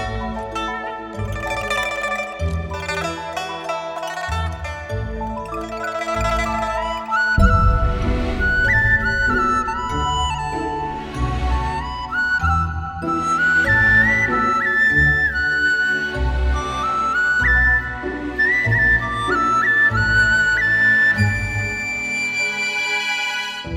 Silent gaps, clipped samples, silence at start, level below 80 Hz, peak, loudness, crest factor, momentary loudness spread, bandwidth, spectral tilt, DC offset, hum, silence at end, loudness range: none; under 0.1%; 0 s; -28 dBFS; -2 dBFS; -18 LUFS; 18 dB; 12 LU; 15.5 kHz; -4.5 dB/octave; under 0.1%; none; 0 s; 9 LU